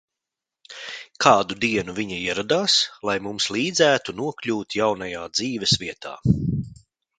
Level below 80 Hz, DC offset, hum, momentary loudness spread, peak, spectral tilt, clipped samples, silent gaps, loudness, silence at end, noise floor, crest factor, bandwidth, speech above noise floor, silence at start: -48 dBFS; under 0.1%; none; 15 LU; 0 dBFS; -3.5 dB/octave; under 0.1%; none; -22 LUFS; 0.45 s; -87 dBFS; 24 dB; 9.6 kHz; 64 dB; 0.7 s